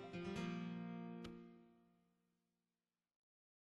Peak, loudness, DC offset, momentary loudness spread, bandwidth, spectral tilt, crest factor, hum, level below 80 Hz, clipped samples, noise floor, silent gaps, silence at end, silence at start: -34 dBFS; -49 LUFS; under 0.1%; 15 LU; 10.5 kHz; -6.5 dB/octave; 18 dB; none; -76 dBFS; under 0.1%; under -90 dBFS; none; 1.85 s; 0 s